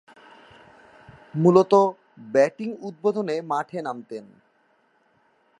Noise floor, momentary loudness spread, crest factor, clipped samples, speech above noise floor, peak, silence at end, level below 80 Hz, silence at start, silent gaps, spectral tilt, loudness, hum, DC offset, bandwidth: -64 dBFS; 17 LU; 22 dB; under 0.1%; 43 dB; -2 dBFS; 1.4 s; -72 dBFS; 1.35 s; none; -7.5 dB/octave; -22 LUFS; none; under 0.1%; 10.5 kHz